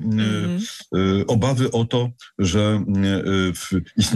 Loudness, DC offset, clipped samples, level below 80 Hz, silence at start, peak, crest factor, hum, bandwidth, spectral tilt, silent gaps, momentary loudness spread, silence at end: -21 LUFS; under 0.1%; under 0.1%; -48 dBFS; 0 s; -6 dBFS; 14 dB; none; 12.5 kHz; -6 dB/octave; none; 6 LU; 0 s